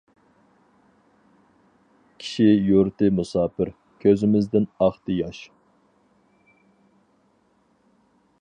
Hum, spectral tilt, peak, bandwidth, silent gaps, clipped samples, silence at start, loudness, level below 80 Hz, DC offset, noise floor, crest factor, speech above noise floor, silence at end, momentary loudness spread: none; -8 dB/octave; -6 dBFS; 9.8 kHz; none; under 0.1%; 2.2 s; -22 LUFS; -54 dBFS; under 0.1%; -64 dBFS; 20 dB; 43 dB; 2.95 s; 13 LU